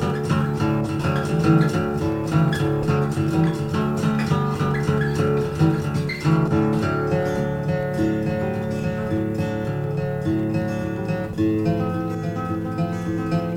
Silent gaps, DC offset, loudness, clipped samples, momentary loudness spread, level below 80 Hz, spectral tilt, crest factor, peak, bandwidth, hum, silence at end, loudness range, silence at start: none; under 0.1%; -22 LUFS; under 0.1%; 5 LU; -44 dBFS; -7.5 dB/octave; 16 dB; -6 dBFS; 16 kHz; none; 0 s; 3 LU; 0 s